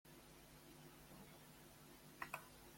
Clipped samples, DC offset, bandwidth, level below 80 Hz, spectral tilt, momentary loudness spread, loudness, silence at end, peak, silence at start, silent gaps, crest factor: under 0.1%; under 0.1%; 16.5 kHz; -74 dBFS; -3.5 dB/octave; 10 LU; -58 LUFS; 0 s; -32 dBFS; 0.05 s; none; 28 dB